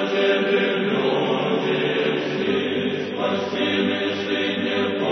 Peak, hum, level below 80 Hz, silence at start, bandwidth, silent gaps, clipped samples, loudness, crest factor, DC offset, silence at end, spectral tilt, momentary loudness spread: -8 dBFS; none; -68 dBFS; 0 s; 6.4 kHz; none; under 0.1%; -22 LUFS; 14 dB; under 0.1%; 0 s; -6 dB/octave; 4 LU